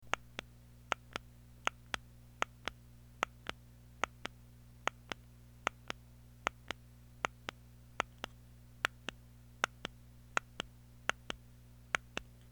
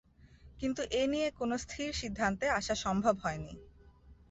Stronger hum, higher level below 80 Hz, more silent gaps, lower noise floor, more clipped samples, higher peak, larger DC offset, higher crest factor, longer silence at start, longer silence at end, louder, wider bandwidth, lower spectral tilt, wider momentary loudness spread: first, 60 Hz at -60 dBFS vs none; second, -62 dBFS vs -54 dBFS; neither; about the same, -58 dBFS vs -59 dBFS; neither; first, -10 dBFS vs -16 dBFS; neither; first, 34 dB vs 20 dB; second, 0 s vs 0.25 s; first, 0.3 s vs 0.15 s; second, -42 LUFS vs -34 LUFS; first, over 20 kHz vs 8.2 kHz; second, -2.5 dB/octave vs -4.5 dB/octave; first, 20 LU vs 8 LU